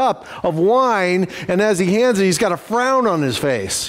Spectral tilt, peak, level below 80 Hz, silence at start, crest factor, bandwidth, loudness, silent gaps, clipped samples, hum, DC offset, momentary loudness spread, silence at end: -4.5 dB/octave; -6 dBFS; -52 dBFS; 0 s; 12 dB; 16 kHz; -17 LUFS; none; under 0.1%; none; under 0.1%; 5 LU; 0 s